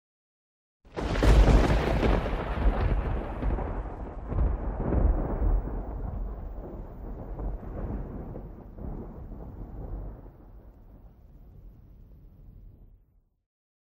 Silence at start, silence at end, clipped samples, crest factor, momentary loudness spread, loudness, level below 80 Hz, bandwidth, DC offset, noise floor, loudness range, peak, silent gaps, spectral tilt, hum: 0.9 s; 1.15 s; under 0.1%; 22 dB; 19 LU; -30 LUFS; -30 dBFS; 8.8 kHz; under 0.1%; -64 dBFS; 19 LU; -8 dBFS; none; -7.5 dB/octave; none